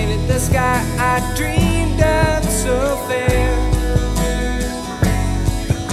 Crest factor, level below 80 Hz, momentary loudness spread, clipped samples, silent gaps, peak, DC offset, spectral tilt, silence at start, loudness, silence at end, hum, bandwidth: 16 dB; -22 dBFS; 4 LU; under 0.1%; none; -2 dBFS; under 0.1%; -5 dB/octave; 0 s; -18 LUFS; 0 s; none; 15.5 kHz